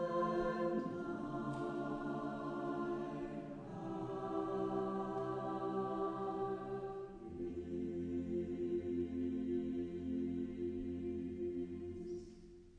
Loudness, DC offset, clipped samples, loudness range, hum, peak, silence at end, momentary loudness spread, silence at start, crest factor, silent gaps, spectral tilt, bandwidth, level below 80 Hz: -42 LUFS; under 0.1%; under 0.1%; 2 LU; none; -26 dBFS; 0 s; 7 LU; 0 s; 16 dB; none; -8.5 dB/octave; 9.4 kHz; -62 dBFS